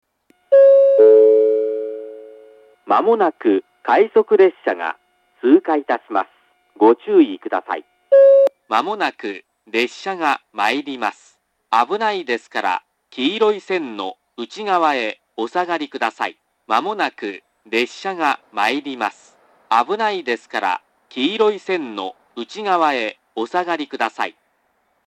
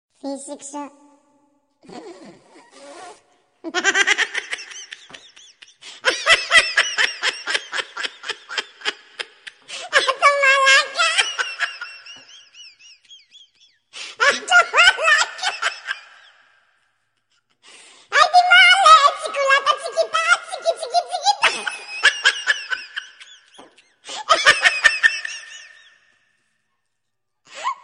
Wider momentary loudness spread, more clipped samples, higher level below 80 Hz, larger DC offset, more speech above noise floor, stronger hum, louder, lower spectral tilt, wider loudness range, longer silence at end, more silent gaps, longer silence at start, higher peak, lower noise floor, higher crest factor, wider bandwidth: second, 16 LU vs 21 LU; neither; second, -78 dBFS vs -62 dBFS; neither; second, 46 dB vs 55 dB; neither; about the same, -18 LUFS vs -16 LUFS; first, -4.5 dB/octave vs 1.5 dB/octave; second, 6 LU vs 9 LU; first, 0.75 s vs 0.1 s; neither; first, 0.5 s vs 0.25 s; about the same, 0 dBFS vs 0 dBFS; second, -65 dBFS vs -80 dBFS; about the same, 18 dB vs 20 dB; second, 9 kHz vs 10.5 kHz